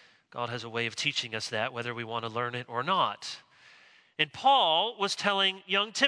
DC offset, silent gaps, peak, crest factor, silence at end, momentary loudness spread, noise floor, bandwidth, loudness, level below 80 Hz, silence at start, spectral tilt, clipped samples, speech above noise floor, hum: under 0.1%; none; -8 dBFS; 22 dB; 0 s; 14 LU; -58 dBFS; 10.5 kHz; -29 LUFS; -80 dBFS; 0.35 s; -2.5 dB/octave; under 0.1%; 29 dB; none